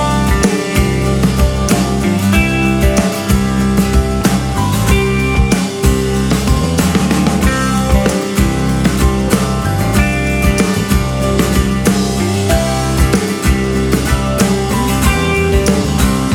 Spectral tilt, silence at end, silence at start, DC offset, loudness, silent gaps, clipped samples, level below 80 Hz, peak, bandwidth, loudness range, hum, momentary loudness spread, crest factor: -5.5 dB/octave; 0 s; 0 s; under 0.1%; -13 LUFS; none; under 0.1%; -18 dBFS; 0 dBFS; 17.5 kHz; 1 LU; none; 2 LU; 12 dB